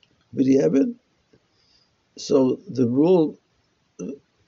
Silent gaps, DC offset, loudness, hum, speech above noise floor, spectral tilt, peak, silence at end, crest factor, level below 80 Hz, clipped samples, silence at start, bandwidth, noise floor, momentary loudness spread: none; under 0.1%; -20 LUFS; none; 47 dB; -8 dB/octave; -6 dBFS; 0.3 s; 16 dB; -68 dBFS; under 0.1%; 0.35 s; 7.4 kHz; -67 dBFS; 18 LU